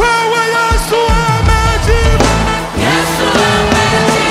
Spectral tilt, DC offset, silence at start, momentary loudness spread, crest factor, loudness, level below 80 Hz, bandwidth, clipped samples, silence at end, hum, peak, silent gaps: -4.5 dB/octave; under 0.1%; 0 s; 2 LU; 10 dB; -11 LUFS; -18 dBFS; 16 kHz; under 0.1%; 0 s; none; 0 dBFS; none